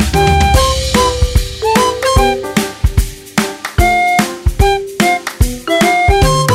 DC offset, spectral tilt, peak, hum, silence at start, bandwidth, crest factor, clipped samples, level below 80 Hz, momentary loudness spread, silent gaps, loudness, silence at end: under 0.1%; -4.5 dB/octave; 0 dBFS; none; 0 s; 16.5 kHz; 12 dB; under 0.1%; -18 dBFS; 7 LU; none; -13 LUFS; 0 s